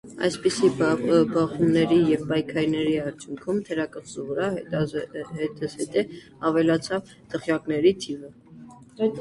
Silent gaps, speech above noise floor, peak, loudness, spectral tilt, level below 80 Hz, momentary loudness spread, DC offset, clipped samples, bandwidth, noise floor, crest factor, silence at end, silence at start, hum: none; 22 dB; -8 dBFS; -25 LUFS; -6 dB/octave; -58 dBFS; 12 LU; under 0.1%; under 0.1%; 11.5 kHz; -46 dBFS; 16 dB; 0 s; 0.05 s; none